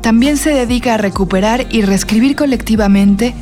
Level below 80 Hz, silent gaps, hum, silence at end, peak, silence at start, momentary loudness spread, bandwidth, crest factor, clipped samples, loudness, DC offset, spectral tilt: -28 dBFS; none; none; 0 s; -2 dBFS; 0 s; 4 LU; 16 kHz; 8 dB; under 0.1%; -12 LUFS; under 0.1%; -5.5 dB/octave